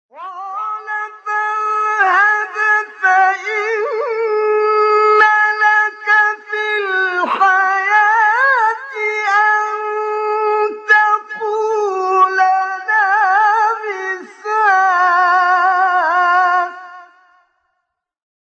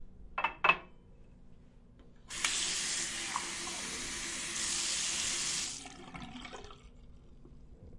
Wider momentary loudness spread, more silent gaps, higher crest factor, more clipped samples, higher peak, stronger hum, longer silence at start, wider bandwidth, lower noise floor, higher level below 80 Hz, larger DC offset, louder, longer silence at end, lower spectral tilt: second, 10 LU vs 17 LU; neither; second, 14 dB vs 28 dB; neither; first, 0 dBFS vs -10 dBFS; neither; first, 0.15 s vs 0 s; second, 8.2 kHz vs 11.5 kHz; first, -73 dBFS vs -57 dBFS; second, -82 dBFS vs -58 dBFS; neither; first, -14 LUFS vs -33 LUFS; first, 1.55 s vs 0 s; about the same, -1 dB/octave vs 0 dB/octave